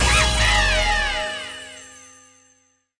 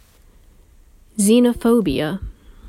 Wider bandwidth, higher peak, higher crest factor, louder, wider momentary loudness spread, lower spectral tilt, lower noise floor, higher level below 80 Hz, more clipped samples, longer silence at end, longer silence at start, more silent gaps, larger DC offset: second, 10.5 kHz vs 16 kHz; about the same, -6 dBFS vs -4 dBFS; about the same, 16 dB vs 16 dB; about the same, -19 LUFS vs -17 LUFS; first, 20 LU vs 17 LU; second, -2 dB/octave vs -5 dB/octave; first, -62 dBFS vs -49 dBFS; first, -28 dBFS vs -40 dBFS; neither; first, 1 s vs 0 s; second, 0 s vs 1.15 s; neither; neither